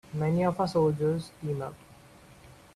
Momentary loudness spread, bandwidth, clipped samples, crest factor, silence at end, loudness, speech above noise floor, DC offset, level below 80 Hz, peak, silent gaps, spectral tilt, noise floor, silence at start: 10 LU; 13 kHz; under 0.1%; 16 dB; 0.3 s; -29 LUFS; 26 dB; under 0.1%; -60 dBFS; -14 dBFS; none; -8 dB/octave; -54 dBFS; 0.1 s